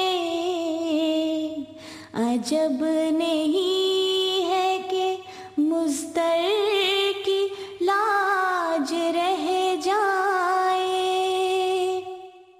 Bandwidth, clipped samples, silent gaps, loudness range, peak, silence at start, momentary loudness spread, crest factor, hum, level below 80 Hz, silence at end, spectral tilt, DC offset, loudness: 15.5 kHz; under 0.1%; none; 1 LU; -12 dBFS; 0 s; 7 LU; 12 dB; none; -68 dBFS; 0.2 s; -2.5 dB/octave; under 0.1%; -23 LUFS